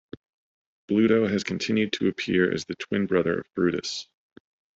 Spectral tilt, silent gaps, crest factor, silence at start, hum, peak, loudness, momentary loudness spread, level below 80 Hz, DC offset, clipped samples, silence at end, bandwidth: -5.5 dB/octave; none; 20 dB; 0.9 s; none; -6 dBFS; -25 LUFS; 9 LU; -64 dBFS; under 0.1%; under 0.1%; 0.75 s; 8 kHz